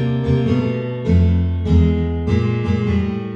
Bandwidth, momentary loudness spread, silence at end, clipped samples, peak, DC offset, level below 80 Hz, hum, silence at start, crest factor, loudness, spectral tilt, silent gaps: 6.4 kHz; 5 LU; 0 s; under 0.1%; -4 dBFS; under 0.1%; -26 dBFS; none; 0 s; 14 dB; -18 LUFS; -9.5 dB/octave; none